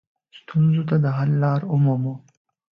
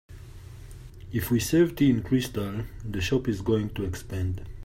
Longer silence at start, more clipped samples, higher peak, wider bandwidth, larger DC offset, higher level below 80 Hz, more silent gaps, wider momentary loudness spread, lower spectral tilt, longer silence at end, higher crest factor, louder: first, 0.35 s vs 0.1 s; neither; about the same, -8 dBFS vs -10 dBFS; second, 5.2 kHz vs 16 kHz; neither; second, -62 dBFS vs -44 dBFS; neither; second, 8 LU vs 23 LU; first, -10.5 dB/octave vs -6 dB/octave; first, 0.6 s vs 0 s; about the same, 14 dB vs 16 dB; first, -21 LUFS vs -27 LUFS